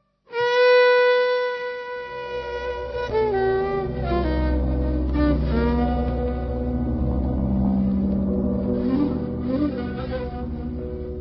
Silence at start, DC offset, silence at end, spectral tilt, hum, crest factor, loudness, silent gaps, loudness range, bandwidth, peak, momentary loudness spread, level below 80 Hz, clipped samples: 0.3 s; under 0.1%; 0 s; -8.5 dB/octave; none; 14 dB; -23 LUFS; none; 4 LU; 6.2 kHz; -8 dBFS; 12 LU; -30 dBFS; under 0.1%